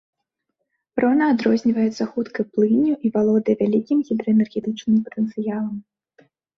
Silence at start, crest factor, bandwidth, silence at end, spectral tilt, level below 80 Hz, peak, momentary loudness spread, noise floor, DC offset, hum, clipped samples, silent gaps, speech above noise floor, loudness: 0.95 s; 14 dB; 6.4 kHz; 0.75 s; -7.5 dB/octave; -64 dBFS; -6 dBFS; 8 LU; -78 dBFS; under 0.1%; none; under 0.1%; none; 58 dB; -21 LUFS